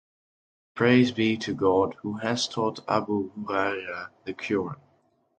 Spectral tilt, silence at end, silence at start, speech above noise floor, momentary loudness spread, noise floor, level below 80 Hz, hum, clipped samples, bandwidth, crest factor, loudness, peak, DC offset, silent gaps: -5.5 dB/octave; 0.65 s; 0.75 s; 41 dB; 15 LU; -67 dBFS; -60 dBFS; none; under 0.1%; 9.2 kHz; 20 dB; -26 LUFS; -8 dBFS; under 0.1%; none